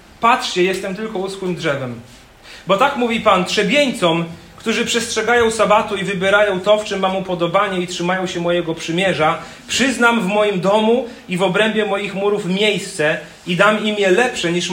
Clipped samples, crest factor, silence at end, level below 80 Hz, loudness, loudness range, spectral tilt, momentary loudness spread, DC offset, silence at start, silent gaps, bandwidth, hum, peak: under 0.1%; 16 dB; 0 s; -52 dBFS; -17 LUFS; 2 LU; -4 dB/octave; 9 LU; under 0.1%; 0.2 s; none; 16.5 kHz; none; 0 dBFS